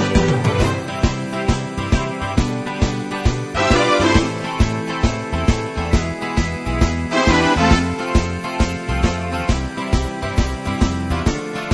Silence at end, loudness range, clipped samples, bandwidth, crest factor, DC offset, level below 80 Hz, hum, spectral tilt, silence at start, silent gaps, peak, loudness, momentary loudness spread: 0 s; 3 LU; under 0.1%; 11 kHz; 18 dB; under 0.1%; -24 dBFS; none; -5.5 dB/octave; 0 s; none; 0 dBFS; -19 LUFS; 7 LU